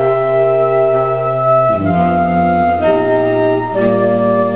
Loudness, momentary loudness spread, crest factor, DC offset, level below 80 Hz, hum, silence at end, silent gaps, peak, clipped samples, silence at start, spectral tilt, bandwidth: -13 LUFS; 2 LU; 12 dB; 0.9%; -40 dBFS; none; 0 s; none; 0 dBFS; under 0.1%; 0 s; -11 dB/octave; 4 kHz